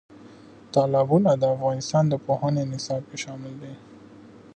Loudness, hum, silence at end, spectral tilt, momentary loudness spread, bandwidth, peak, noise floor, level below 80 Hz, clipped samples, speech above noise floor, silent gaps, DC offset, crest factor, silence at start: -24 LUFS; none; 0.25 s; -6.5 dB/octave; 18 LU; 9.2 kHz; -8 dBFS; -47 dBFS; -64 dBFS; under 0.1%; 24 dB; none; under 0.1%; 18 dB; 0.1 s